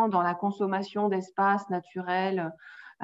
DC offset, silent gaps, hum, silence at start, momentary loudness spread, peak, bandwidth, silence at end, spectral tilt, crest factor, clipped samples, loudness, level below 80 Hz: under 0.1%; none; none; 0 s; 10 LU; -12 dBFS; 7.8 kHz; 0 s; -7 dB/octave; 16 dB; under 0.1%; -29 LUFS; -78 dBFS